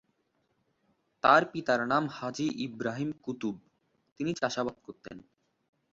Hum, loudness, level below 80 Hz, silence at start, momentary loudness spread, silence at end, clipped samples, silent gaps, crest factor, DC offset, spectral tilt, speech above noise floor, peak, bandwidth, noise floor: none; -30 LUFS; -70 dBFS; 1.25 s; 23 LU; 0.75 s; under 0.1%; 4.12-4.16 s; 24 dB; under 0.1%; -5 dB/octave; 45 dB; -8 dBFS; 7.8 kHz; -76 dBFS